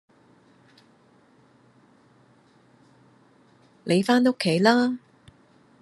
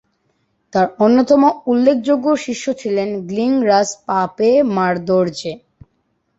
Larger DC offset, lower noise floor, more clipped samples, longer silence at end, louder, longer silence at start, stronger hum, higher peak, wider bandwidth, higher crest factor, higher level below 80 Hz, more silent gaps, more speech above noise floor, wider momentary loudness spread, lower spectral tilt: neither; second, -58 dBFS vs -66 dBFS; neither; about the same, 0.85 s vs 0.8 s; second, -22 LUFS vs -16 LUFS; first, 3.85 s vs 0.75 s; neither; about the same, -4 dBFS vs -2 dBFS; first, 12.5 kHz vs 8 kHz; first, 24 dB vs 14 dB; second, -76 dBFS vs -58 dBFS; neither; second, 38 dB vs 51 dB; first, 14 LU vs 9 LU; about the same, -5.5 dB/octave vs -5.5 dB/octave